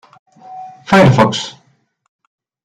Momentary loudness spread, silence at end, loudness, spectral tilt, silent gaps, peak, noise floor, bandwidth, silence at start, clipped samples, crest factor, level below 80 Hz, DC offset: 24 LU; 1.15 s; -11 LUFS; -6 dB/octave; none; 0 dBFS; -33 dBFS; 11.5 kHz; 0.5 s; under 0.1%; 16 dB; -46 dBFS; under 0.1%